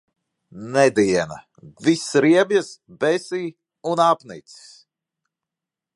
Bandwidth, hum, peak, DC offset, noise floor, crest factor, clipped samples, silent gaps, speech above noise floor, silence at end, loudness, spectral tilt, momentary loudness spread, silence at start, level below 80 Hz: 11.5 kHz; none; -2 dBFS; under 0.1%; -87 dBFS; 20 dB; under 0.1%; none; 67 dB; 1.55 s; -20 LUFS; -5 dB/octave; 20 LU; 0.55 s; -62 dBFS